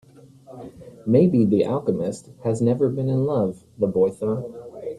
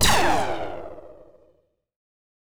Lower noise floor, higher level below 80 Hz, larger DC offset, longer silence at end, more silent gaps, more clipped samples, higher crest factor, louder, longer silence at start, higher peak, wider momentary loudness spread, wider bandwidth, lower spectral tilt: second, -47 dBFS vs -64 dBFS; second, -58 dBFS vs -42 dBFS; neither; second, 0 s vs 0.5 s; neither; neither; about the same, 18 dB vs 20 dB; about the same, -22 LUFS vs -23 LUFS; first, 0.5 s vs 0 s; about the same, -4 dBFS vs -4 dBFS; second, 18 LU vs 22 LU; second, 11.5 kHz vs over 20 kHz; first, -9 dB/octave vs -2.5 dB/octave